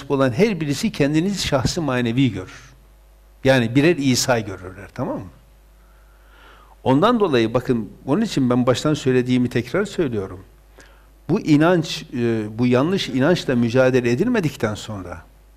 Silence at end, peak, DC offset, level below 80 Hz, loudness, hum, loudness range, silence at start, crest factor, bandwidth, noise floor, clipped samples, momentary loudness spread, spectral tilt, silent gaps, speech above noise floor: 0.35 s; -6 dBFS; under 0.1%; -46 dBFS; -19 LUFS; none; 3 LU; 0 s; 14 dB; 15.5 kHz; -49 dBFS; under 0.1%; 12 LU; -5.5 dB/octave; none; 30 dB